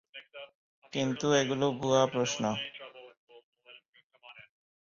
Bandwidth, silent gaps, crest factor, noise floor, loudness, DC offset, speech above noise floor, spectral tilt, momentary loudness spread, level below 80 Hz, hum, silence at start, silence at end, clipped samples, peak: 7.6 kHz; 0.55-0.82 s, 3.17-3.27 s, 3.44-3.52 s, 3.88-3.93 s, 4.03-4.10 s; 22 dB; -58 dBFS; -30 LUFS; under 0.1%; 29 dB; -4.5 dB/octave; 22 LU; -70 dBFS; none; 0.15 s; 0.45 s; under 0.1%; -12 dBFS